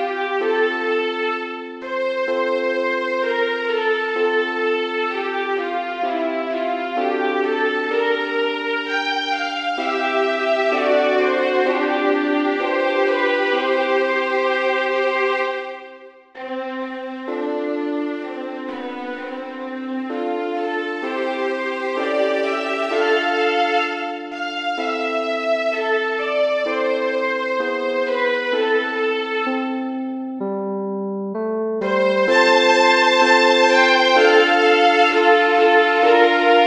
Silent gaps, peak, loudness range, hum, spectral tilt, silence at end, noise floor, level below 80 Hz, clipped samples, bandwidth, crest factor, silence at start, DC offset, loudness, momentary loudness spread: none; -2 dBFS; 11 LU; none; -3.5 dB/octave; 0 s; -42 dBFS; -66 dBFS; under 0.1%; 9.4 kHz; 18 dB; 0 s; under 0.1%; -19 LUFS; 13 LU